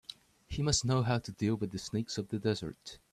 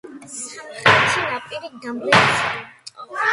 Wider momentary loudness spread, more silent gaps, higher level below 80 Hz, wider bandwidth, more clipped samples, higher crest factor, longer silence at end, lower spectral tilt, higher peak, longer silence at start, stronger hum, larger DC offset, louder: second, 14 LU vs 18 LU; neither; about the same, -54 dBFS vs -56 dBFS; first, 13 kHz vs 11.5 kHz; neither; about the same, 18 dB vs 20 dB; first, 0.15 s vs 0 s; first, -5 dB/octave vs -3 dB/octave; second, -16 dBFS vs 0 dBFS; about the same, 0.1 s vs 0.05 s; neither; neither; second, -34 LUFS vs -17 LUFS